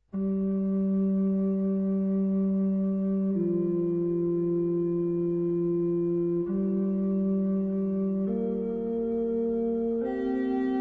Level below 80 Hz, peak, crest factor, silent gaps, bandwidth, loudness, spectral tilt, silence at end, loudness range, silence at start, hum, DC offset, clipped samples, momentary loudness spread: -58 dBFS; -18 dBFS; 8 dB; none; 3.3 kHz; -28 LUFS; -12.5 dB/octave; 0 s; 1 LU; 0.15 s; none; under 0.1%; under 0.1%; 3 LU